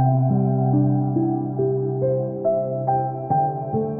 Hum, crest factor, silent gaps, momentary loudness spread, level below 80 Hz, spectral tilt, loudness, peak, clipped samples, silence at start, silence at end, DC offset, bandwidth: none; 12 dB; none; 4 LU; -58 dBFS; -16.5 dB/octave; -22 LUFS; -8 dBFS; under 0.1%; 0 s; 0 s; under 0.1%; 1.7 kHz